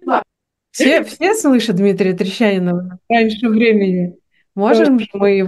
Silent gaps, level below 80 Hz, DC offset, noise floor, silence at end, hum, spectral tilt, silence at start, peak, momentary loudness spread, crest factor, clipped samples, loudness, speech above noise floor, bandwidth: none; -60 dBFS; under 0.1%; -76 dBFS; 0 s; none; -5.5 dB/octave; 0.05 s; 0 dBFS; 8 LU; 14 dB; under 0.1%; -15 LUFS; 62 dB; 12.5 kHz